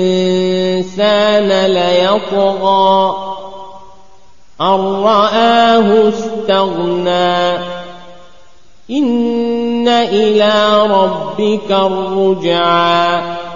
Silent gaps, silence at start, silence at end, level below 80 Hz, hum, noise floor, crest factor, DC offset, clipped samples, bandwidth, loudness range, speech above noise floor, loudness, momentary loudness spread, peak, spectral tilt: none; 0 s; 0 s; -50 dBFS; none; -48 dBFS; 12 dB; 2%; under 0.1%; 7.4 kHz; 4 LU; 36 dB; -12 LUFS; 8 LU; 0 dBFS; -5.5 dB/octave